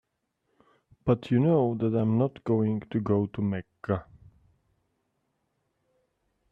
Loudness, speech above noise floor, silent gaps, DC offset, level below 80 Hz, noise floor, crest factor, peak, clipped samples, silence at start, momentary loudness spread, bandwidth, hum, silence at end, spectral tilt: -27 LUFS; 52 dB; none; under 0.1%; -62 dBFS; -78 dBFS; 20 dB; -10 dBFS; under 0.1%; 1.05 s; 9 LU; 5 kHz; none; 2.5 s; -10.5 dB/octave